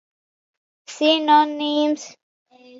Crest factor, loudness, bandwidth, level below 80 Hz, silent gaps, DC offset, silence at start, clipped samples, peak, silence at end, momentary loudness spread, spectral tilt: 18 dB; -19 LUFS; 7.8 kHz; -84 dBFS; 2.23-2.46 s; under 0.1%; 0.9 s; under 0.1%; -4 dBFS; 0 s; 20 LU; -1.5 dB/octave